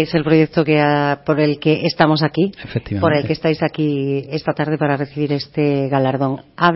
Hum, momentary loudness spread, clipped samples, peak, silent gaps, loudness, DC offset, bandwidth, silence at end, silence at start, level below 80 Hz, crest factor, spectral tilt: none; 6 LU; under 0.1%; 0 dBFS; none; -17 LUFS; under 0.1%; 5.8 kHz; 0 s; 0 s; -50 dBFS; 16 dB; -10 dB/octave